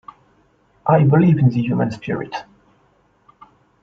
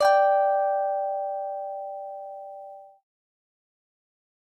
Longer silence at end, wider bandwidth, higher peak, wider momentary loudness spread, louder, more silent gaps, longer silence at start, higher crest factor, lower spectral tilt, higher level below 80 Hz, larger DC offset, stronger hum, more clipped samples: second, 1.4 s vs 1.65 s; second, 6.6 kHz vs 12 kHz; first, -2 dBFS vs -10 dBFS; second, 13 LU vs 20 LU; first, -17 LUFS vs -25 LUFS; neither; first, 0.85 s vs 0 s; about the same, 18 dB vs 18 dB; first, -9.5 dB/octave vs -0.5 dB/octave; first, -54 dBFS vs -80 dBFS; neither; neither; neither